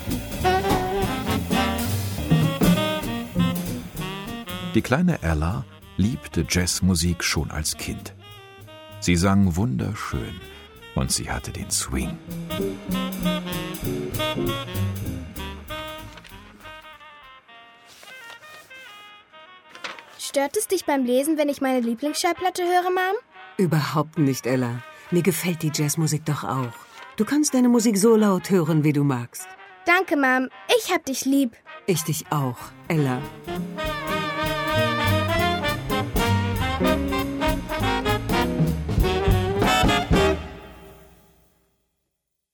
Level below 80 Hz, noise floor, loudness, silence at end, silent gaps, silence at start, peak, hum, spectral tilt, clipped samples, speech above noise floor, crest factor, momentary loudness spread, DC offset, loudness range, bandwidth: -38 dBFS; -79 dBFS; -23 LUFS; 1.6 s; none; 0 s; -6 dBFS; none; -5 dB/octave; under 0.1%; 56 dB; 18 dB; 18 LU; under 0.1%; 9 LU; over 20 kHz